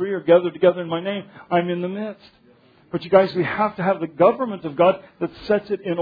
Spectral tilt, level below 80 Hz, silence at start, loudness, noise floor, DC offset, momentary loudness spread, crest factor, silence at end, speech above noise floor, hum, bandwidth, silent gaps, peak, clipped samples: -9 dB/octave; -60 dBFS; 0 s; -21 LUFS; -54 dBFS; under 0.1%; 13 LU; 20 dB; 0 s; 33 dB; none; 5 kHz; none; -2 dBFS; under 0.1%